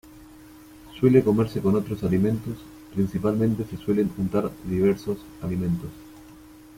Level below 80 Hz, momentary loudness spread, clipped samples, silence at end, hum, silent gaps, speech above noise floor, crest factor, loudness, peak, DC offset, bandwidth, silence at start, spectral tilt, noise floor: -50 dBFS; 14 LU; under 0.1%; 0.45 s; none; none; 24 dB; 20 dB; -24 LUFS; -6 dBFS; under 0.1%; 16.5 kHz; 0.15 s; -8.5 dB/octave; -47 dBFS